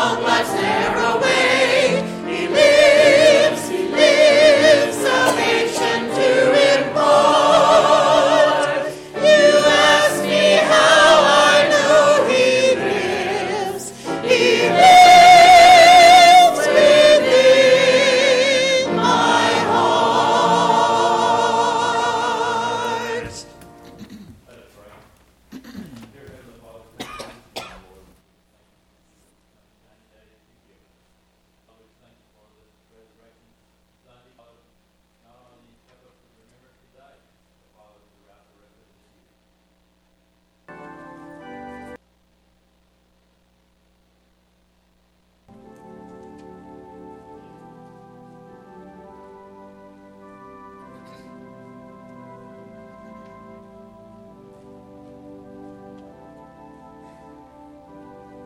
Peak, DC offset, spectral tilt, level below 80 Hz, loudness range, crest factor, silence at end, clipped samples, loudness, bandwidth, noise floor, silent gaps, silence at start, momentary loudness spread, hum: -2 dBFS; under 0.1%; -2.5 dB/octave; -54 dBFS; 11 LU; 14 dB; 16.5 s; under 0.1%; -13 LUFS; 16 kHz; -62 dBFS; none; 0 s; 17 LU; 60 Hz at -60 dBFS